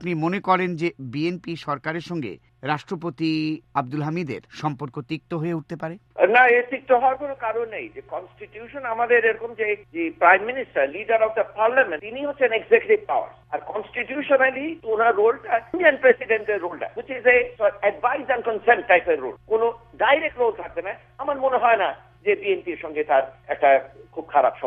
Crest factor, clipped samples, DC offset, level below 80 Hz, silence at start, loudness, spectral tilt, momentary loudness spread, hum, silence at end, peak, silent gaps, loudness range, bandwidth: 20 dB; under 0.1%; under 0.1%; -60 dBFS; 0 s; -22 LUFS; -7 dB/octave; 13 LU; none; 0 s; -2 dBFS; none; 7 LU; 7.4 kHz